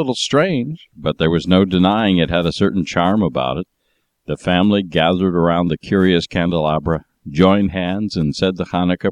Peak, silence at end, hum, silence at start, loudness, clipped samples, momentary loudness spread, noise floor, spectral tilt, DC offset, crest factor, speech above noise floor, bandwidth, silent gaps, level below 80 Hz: -2 dBFS; 0 s; none; 0 s; -17 LUFS; under 0.1%; 10 LU; -67 dBFS; -6.5 dB/octave; under 0.1%; 16 dB; 51 dB; 10 kHz; none; -42 dBFS